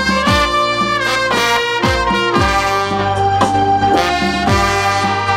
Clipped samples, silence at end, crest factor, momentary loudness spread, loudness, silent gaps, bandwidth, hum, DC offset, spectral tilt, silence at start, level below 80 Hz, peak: under 0.1%; 0 s; 14 dB; 2 LU; -14 LUFS; none; 16 kHz; none; under 0.1%; -4 dB/octave; 0 s; -30 dBFS; 0 dBFS